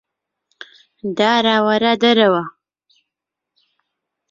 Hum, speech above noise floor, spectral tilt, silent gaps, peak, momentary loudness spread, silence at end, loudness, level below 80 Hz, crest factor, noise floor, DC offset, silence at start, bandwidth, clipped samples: 50 Hz at -50 dBFS; 68 dB; -5 dB/octave; none; -2 dBFS; 14 LU; 1.8 s; -15 LUFS; -64 dBFS; 18 dB; -83 dBFS; under 0.1%; 1.05 s; 7.6 kHz; under 0.1%